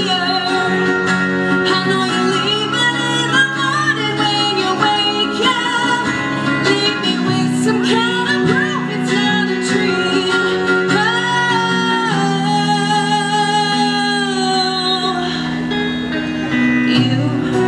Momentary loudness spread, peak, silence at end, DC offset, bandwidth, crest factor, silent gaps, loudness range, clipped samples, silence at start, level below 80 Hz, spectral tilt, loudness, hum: 3 LU; 0 dBFS; 0 s; under 0.1%; 11.5 kHz; 16 dB; none; 2 LU; under 0.1%; 0 s; -52 dBFS; -4.5 dB/octave; -15 LUFS; none